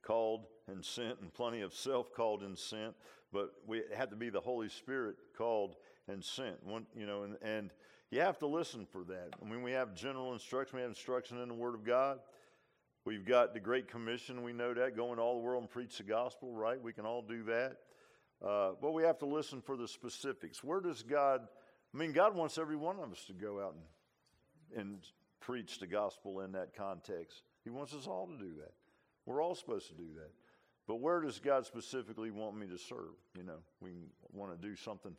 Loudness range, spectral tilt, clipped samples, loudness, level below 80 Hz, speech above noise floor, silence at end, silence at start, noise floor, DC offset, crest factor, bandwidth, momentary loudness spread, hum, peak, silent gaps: 8 LU; -4.5 dB/octave; under 0.1%; -40 LUFS; -80 dBFS; 37 dB; 0 s; 0.05 s; -77 dBFS; under 0.1%; 22 dB; 14.5 kHz; 16 LU; none; -18 dBFS; none